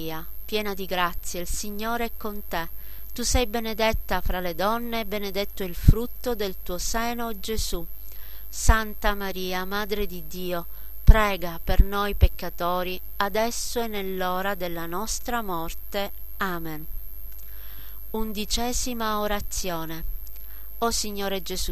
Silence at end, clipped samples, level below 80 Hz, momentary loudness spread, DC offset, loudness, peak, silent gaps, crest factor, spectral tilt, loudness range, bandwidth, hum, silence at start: 0 s; under 0.1%; -28 dBFS; 14 LU; 3%; -27 LUFS; 0 dBFS; none; 26 dB; -4 dB/octave; 5 LU; 14 kHz; none; 0 s